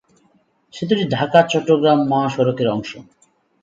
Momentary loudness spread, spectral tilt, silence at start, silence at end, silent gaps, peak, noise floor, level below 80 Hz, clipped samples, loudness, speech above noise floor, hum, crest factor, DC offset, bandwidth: 14 LU; -6.5 dB/octave; 0.75 s; 0.6 s; none; 0 dBFS; -59 dBFS; -60 dBFS; under 0.1%; -17 LUFS; 43 dB; none; 18 dB; under 0.1%; 7.8 kHz